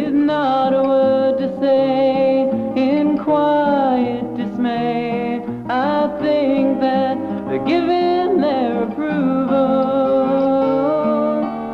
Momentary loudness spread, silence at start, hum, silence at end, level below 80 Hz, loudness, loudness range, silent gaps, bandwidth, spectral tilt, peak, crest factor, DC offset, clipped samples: 6 LU; 0 s; none; 0 s; -52 dBFS; -17 LUFS; 3 LU; none; 5.8 kHz; -8 dB/octave; -6 dBFS; 10 dB; under 0.1%; under 0.1%